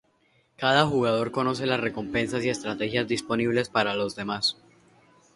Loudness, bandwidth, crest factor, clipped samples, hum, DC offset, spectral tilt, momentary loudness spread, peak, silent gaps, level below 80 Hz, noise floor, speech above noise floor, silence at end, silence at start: -26 LUFS; 11.5 kHz; 22 dB; under 0.1%; none; under 0.1%; -4.5 dB/octave; 7 LU; -6 dBFS; none; -58 dBFS; -66 dBFS; 40 dB; 0.85 s; 0.6 s